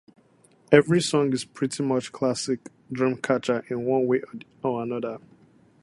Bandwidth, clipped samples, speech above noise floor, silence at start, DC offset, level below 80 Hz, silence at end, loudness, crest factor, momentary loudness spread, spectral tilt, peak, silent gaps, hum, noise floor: 11.5 kHz; under 0.1%; 35 dB; 0.7 s; under 0.1%; -64 dBFS; 0.65 s; -25 LUFS; 24 dB; 12 LU; -5.5 dB/octave; -2 dBFS; none; none; -59 dBFS